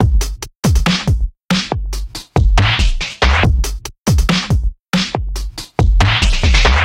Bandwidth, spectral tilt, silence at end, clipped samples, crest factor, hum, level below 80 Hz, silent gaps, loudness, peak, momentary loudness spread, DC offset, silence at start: 16 kHz; -4.5 dB/octave; 0 s; under 0.1%; 14 dB; none; -16 dBFS; 1.44-1.49 s; -16 LUFS; 0 dBFS; 10 LU; under 0.1%; 0 s